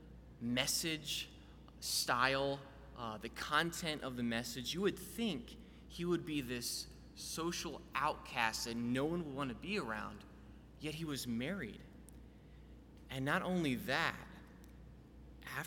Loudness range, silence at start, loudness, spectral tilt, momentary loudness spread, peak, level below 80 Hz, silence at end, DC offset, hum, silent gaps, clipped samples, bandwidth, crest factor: 5 LU; 0 s; -39 LUFS; -3.5 dB/octave; 23 LU; -16 dBFS; -60 dBFS; 0 s; under 0.1%; none; none; under 0.1%; 19 kHz; 24 dB